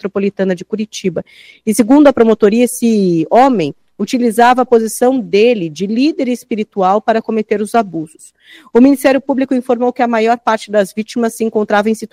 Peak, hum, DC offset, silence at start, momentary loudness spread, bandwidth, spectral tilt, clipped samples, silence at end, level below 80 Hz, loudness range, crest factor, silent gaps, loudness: 0 dBFS; none; under 0.1%; 0.05 s; 10 LU; 16.5 kHz; -5.5 dB/octave; 0.2%; 0.05 s; -52 dBFS; 3 LU; 12 dB; none; -13 LUFS